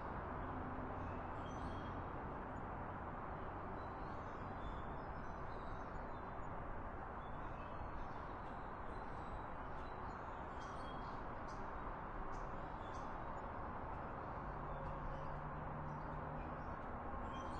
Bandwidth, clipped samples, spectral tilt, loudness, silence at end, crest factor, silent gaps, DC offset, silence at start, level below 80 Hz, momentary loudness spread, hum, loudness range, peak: 9 kHz; under 0.1%; -7.5 dB/octave; -49 LUFS; 0 s; 14 dB; none; under 0.1%; 0 s; -54 dBFS; 3 LU; none; 2 LU; -34 dBFS